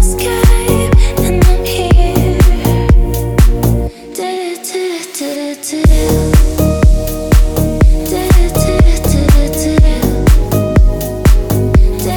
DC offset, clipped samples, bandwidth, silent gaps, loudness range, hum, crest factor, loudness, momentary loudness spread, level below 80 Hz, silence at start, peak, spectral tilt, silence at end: under 0.1%; 0.3%; over 20 kHz; none; 3 LU; none; 10 dB; -12 LUFS; 8 LU; -12 dBFS; 0 s; 0 dBFS; -6 dB/octave; 0 s